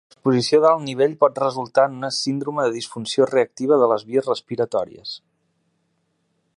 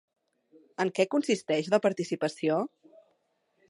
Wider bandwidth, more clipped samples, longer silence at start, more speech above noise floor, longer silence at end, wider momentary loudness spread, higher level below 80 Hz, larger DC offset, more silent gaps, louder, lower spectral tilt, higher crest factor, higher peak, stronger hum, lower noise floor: about the same, 11.5 kHz vs 11.5 kHz; neither; second, 0.25 s vs 0.8 s; first, 50 dB vs 46 dB; first, 1.4 s vs 1 s; first, 9 LU vs 6 LU; first, -68 dBFS vs -82 dBFS; neither; neither; first, -20 LUFS vs -29 LUFS; about the same, -5 dB/octave vs -5 dB/octave; about the same, 20 dB vs 20 dB; first, -2 dBFS vs -10 dBFS; neither; second, -69 dBFS vs -74 dBFS